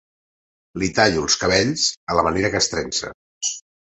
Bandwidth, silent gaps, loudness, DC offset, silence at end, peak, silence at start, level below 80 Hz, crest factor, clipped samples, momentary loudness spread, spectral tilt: 8.4 kHz; 1.97-2.07 s, 3.14-3.41 s; -20 LUFS; under 0.1%; 0.4 s; -2 dBFS; 0.75 s; -44 dBFS; 20 dB; under 0.1%; 9 LU; -2.5 dB/octave